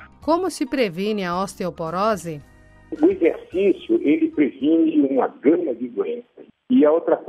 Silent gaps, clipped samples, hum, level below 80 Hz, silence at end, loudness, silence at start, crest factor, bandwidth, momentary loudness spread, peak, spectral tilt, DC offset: none; under 0.1%; none; -56 dBFS; 0 s; -21 LUFS; 0 s; 16 dB; 13 kHz; 10 LU; -4 dBFS; -6 dB/octave; under 0.1%